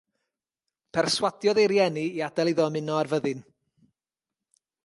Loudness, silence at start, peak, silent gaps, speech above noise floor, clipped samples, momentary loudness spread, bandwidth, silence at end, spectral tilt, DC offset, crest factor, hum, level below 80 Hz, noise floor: -25 LUFS; 0.95 s; -8 dBFS; none; over 65 dB; under 0.1%; 9 LU; 11.5 kHz; 1.45 s; -4.5 dB/octave; under 0.1%; 18 dB; none; -70 dBFS; under -90 dBFS